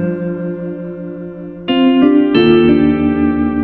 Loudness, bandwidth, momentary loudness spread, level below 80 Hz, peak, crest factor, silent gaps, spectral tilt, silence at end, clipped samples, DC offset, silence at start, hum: -12 LUFS; 4.6 kHz; 16 LU; -36 dBFS; 0 dBFS; 12 dB; none; -10 dB/octave; 0 s; under 0.1%; under 0.1%; 0 s; none